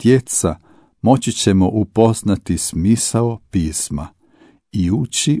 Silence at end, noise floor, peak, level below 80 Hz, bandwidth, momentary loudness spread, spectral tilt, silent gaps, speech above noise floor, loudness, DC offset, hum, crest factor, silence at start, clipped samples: 0 s; -51 dBFS; 0 dBFS; -38 dBFS; 11 kHz; 8 LU; -5 dB/octave; none; 35 dB; -17 LUFS; under 0.1%; none; 16 dB; 0 s; under 0.1%